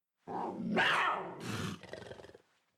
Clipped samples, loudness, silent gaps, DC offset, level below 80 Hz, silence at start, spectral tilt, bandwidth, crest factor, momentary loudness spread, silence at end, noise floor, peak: under 0.1%; -34 LUFS; none; under 0.1%; -72 dBFS; 0.25 s; -4 dB/octave; 15 kHz; 18 dB; 19 LU; 0.45 s; -62 dBFS; -20 dBFS